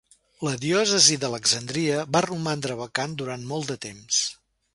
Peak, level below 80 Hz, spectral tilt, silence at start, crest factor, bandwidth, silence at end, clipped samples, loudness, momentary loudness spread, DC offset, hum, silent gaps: -2 dBFS; -62 dBFS; -2.5 dB/octave; 0.4 s; 24 dB; 11.5 kHz; 0.4 s; under 0.1%; -23 LUFS; 14 LU; under 0.1%; none; none